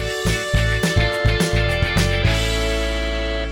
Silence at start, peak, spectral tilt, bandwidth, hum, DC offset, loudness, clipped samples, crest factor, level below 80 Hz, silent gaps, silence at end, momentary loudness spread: 0 s; -6 dBFS; -4.5 dB/octave; 16.5 kHz; none; under 0.1%; -19 LUFS; under 0.1%; 12 dB; -24 dBFS; none; 0 s; 4 LU